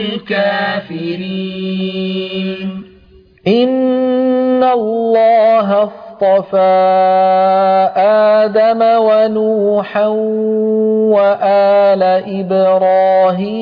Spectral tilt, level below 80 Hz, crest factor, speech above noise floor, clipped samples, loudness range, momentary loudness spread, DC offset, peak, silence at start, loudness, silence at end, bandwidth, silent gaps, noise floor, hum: -8.5 dB/octave; -58 dBFS; 10 dB; 32 dB; under 0.1%; 7 LU; 10 LU; under 0.1%; -2 dBFS; 0 s; -12 LUFS; 0 s; 5.2 kHz; none; -44 dBFS; none